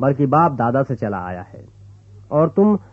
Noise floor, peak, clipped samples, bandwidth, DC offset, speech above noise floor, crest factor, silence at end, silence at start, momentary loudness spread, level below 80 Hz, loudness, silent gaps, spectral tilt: -43 dBFS; -2 dBFS; under 0.1%; 6.6 kHz; under 0.1%; 25 dB; 16 dB; 0.1 s; 0 s; 15 LU; -54 dBFS; -18 LUFS; none; -11 dB/octave